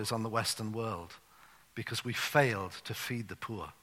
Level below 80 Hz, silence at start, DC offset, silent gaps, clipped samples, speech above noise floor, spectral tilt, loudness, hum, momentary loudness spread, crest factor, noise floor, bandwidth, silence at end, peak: -66 dBFS; 0 s; under 0.1%; none; under 0.1%; 26 dB; -4 dB/octave; -34 LUFS; none; 15 LU; 24 dB; -61 dBFS; 16.5 kHz; 0.1 s; -10 dBFS